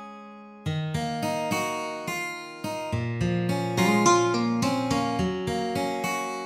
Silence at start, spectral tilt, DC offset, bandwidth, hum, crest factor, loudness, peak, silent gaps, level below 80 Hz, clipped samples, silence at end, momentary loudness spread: 0 s; -5 dB/octave; under 0.1%; 16 kHz; none; 18 dB; -26 LUFS; -8 dBFS; none; -52 dBFS; under 0.1%; 0 s; 12 LU